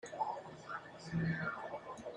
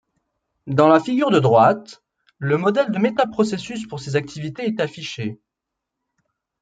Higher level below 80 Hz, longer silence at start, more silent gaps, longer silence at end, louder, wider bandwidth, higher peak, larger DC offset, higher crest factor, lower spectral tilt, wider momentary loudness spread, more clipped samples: second, -68 dBFS vs -62 dBFS; second, 0.05 s vs 0.65 s; neither; second, 0 s vs 1.25 s; second, -42 LUFS vs -19 LUFS; about the same, 9.8 kHz vs 9.2 kHz; second, -26 dBFS vs 0 dBFS; neither; about the same, 16 dB vs 20 dB; about the same, -6.5 dB/octave vs -6.5 dB/octave; second, 9 LU vs 15 LU; neither